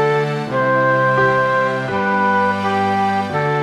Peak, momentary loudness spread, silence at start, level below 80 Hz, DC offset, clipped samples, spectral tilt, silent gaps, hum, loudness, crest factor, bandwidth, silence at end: -4 dBFS; 4 LU; 0 s; -56 dBFS; under 0.1%; under 0.1%; -6.5 dB/octave; none; none; -16 LUFS; 12 dB; 12 kHz; 0 s